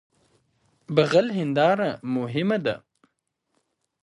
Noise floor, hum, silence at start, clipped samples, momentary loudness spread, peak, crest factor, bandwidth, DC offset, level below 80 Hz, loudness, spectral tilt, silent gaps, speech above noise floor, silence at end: -76 dBFS; none; 0.9 s; under 0.1%; 8 LU; -4 dBFS; 20 dB; 11 kHz; under 0.1%; -68 dBFS; -23 LUFS; -6.5 dB/octave; none; 54 dB; 1.25 s